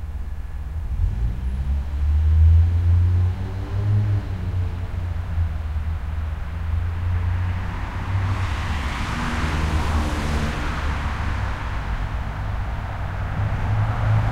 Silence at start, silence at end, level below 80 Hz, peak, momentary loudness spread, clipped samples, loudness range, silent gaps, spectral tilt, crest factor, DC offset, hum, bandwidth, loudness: 0 s; 0 s; -26 dBFS; -8 dBFS; 10 LU; under 0.1%; 6 LU; none; -7 dB/octave; 14 dB; under 0.1%; none; 10 kHz; -24 LUFS